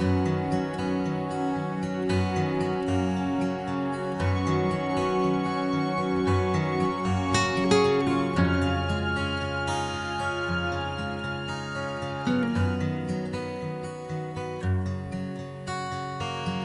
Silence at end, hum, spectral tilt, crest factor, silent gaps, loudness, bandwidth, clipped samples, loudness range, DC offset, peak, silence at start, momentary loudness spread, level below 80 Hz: 0 s; none; -6.5 dB/octave; 18 dB; none; -27 LUFS; 11.5 kHz; under 0.1%; 5 LU; under 0.1%; -8 dBFS; 0 s; 8 LU; -48 dBFS